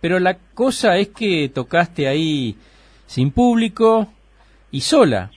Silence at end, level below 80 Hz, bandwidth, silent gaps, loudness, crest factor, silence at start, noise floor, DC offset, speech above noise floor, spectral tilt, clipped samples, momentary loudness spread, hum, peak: 0.1 s; -44 dBFS; 11 kHz; none; -17 LUFS; 16 dB; 0 s; -51 dBFS; under 0.1%; 34 dB; -5.5 dB/octave; under 0.1%; 9 LU; none; 0 dBFS